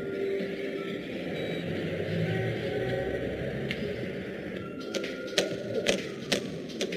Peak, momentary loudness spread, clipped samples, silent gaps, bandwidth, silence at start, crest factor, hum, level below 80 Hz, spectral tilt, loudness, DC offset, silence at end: -6 dBFS; 6 LU; under 0.1%; none; 15.5 kHz; 0 s; 26 dB; none; -54 dBFS; -4.5 dB/octave; -32 LUFS; under 0.1%; 0 s